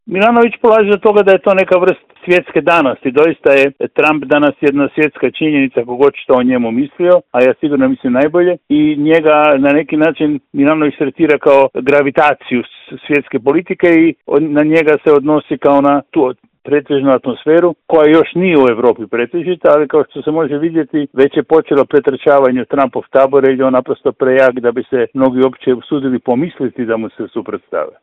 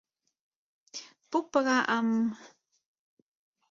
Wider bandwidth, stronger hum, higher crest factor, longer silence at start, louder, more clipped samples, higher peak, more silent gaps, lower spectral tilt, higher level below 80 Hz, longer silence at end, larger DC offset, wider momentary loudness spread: about the same, 7.8 kHz vs 7.4 kHz; neither; second, 12 dB vs 20 dB; second, 0.1 s vs 0.95 s; first, -12 LUFS vs -28 LUFS; first, 0.2% vs under 0.1%; first, 0 dBFS vs -12 dBFS; neither; first, -8 dB/octave vs -4 dB/octave; first, -54 dBFS vs -80 dBFS; second, 0.15 s vs 1.25 s; neither; second, 7 LU vs 18 LU